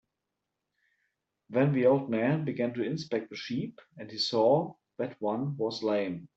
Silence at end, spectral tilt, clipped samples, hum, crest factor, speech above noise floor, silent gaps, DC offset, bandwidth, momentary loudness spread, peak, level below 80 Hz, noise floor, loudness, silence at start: 0.1 s; -7 dB/octave; under 0.1%; none; 18 dB; 56 dB; none; under 0.1%; 8 kHz; 13 LU; -12 dBFS; -74 dBFS; -86 dBFS; -30 LUFS; 1.5 s